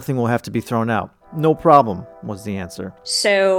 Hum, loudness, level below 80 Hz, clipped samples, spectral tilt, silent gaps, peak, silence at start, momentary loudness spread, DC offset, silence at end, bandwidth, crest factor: none; -18 LUFS; -54 dBFS; under 0.1%; -5 dB/octave; none; 0 dBFS; 0 s; 18 LU; under 0.1%; 0 s; 18 kHz; 18 dB